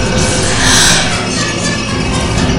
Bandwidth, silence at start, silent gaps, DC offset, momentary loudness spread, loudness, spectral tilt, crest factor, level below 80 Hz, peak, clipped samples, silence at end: over 20 kHz; 0 s; none; under 0.1%; 8 LU; -11 LUFS; -3 dB/octave; 12 dB; -24 dBFS; 0 dBFS; 0.2%; 0 s